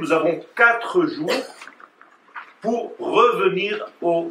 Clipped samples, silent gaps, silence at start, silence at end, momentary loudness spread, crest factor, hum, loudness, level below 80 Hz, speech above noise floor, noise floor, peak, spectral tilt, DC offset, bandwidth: under 0.1%; none; 0 s; 0 s; 21 LU; 20 dB; none; -20 LUFS; -82 dBFS; 31 dB; -52 dBFS; -2 dBFS; -5 dB/octave; under 0.1%; 14.5 kHz